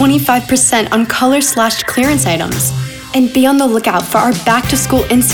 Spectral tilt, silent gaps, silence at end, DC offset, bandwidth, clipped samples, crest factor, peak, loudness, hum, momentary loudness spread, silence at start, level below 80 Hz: -3.5 dB/octave; none; 0 s; under 0.1%; over 20 kHz; under 0.1%; 12 dB; 0 dBFS; -12 LUFS; none; 4 LU; 0 s; -36 dBFS